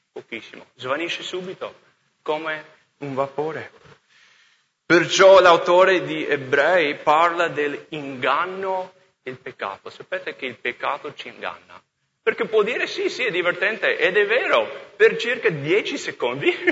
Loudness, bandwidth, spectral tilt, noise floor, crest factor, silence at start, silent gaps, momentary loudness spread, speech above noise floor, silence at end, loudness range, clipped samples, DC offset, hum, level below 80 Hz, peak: -20 LUFS; 8 kHz; -4 dB/octave; -61 dBFS; 20 dB; 0.15 s; none; 19 LU; 40 dB; 0 s; 13 LU; under 0.1%; under 0.1%; none; -68 dBFS; -2 dBFS